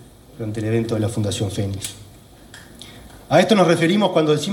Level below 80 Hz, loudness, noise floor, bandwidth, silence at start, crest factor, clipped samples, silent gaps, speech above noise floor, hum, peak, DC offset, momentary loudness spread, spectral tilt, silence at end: -50 dBFS; -19 LUFS; -44 dBFS; 17 kHz; 0 s; 18 dB; under 0.1%; none; 25 dB; none; -2 dBFS; under 0.1%; 22 LU; -5.5 dB/octave; 0 s